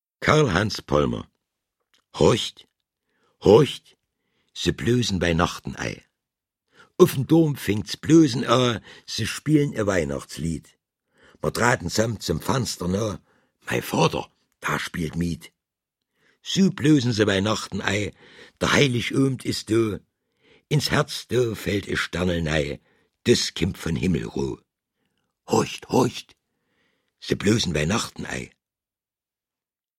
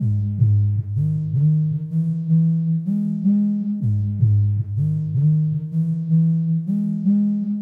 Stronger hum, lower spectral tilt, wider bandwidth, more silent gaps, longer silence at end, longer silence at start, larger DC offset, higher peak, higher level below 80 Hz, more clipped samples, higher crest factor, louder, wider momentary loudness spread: neither; second, -5 dB/octave vs -12.5 dB/octave; first, 16.5 kHz vs 1 kHz; neither; first, 1.5 s vs 0 s; first, 0.2 s vs 0 s; neither; first, -2 dBFS vs -6 dBFS; first, -46 dBFS vs -52 dBFS; neither; first, 22 dB vs 12 dB; second, -23 LUFS vs -20 LUFS; first, 13 LU vs 4 LU